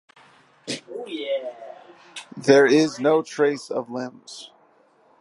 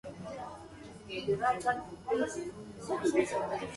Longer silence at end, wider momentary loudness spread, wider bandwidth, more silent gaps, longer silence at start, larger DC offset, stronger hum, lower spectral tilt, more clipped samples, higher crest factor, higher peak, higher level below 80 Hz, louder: first, 0.75 s vs 0 s; first, 24 LU vs 16 LU; about the same, 11.5 kHz vs 11.5 kHz; neither; first, 0.65 s vs 0.05 s; neither; neither; about the same, -4.5 dB/octave vs -5 dB/octave; neither; about the same, 22 dB vs 20 dB; first, -2 dBFS vs -14 dBFS; second, -78 dBFS vs -62 dBFS; first, -22 LUFS vs -34 LUFS